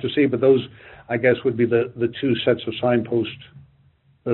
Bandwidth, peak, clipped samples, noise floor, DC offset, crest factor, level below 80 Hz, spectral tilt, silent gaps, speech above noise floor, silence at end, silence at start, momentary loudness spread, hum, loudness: 4.2 kHz; -4 dBFS; under 0.1%; -58 dBFS; under 0.1%; 16 dB; -60 dBFS; -5 dB/octave; none; 38 dB; 0 s; 0 s; 12 LU; none; -21 LUFS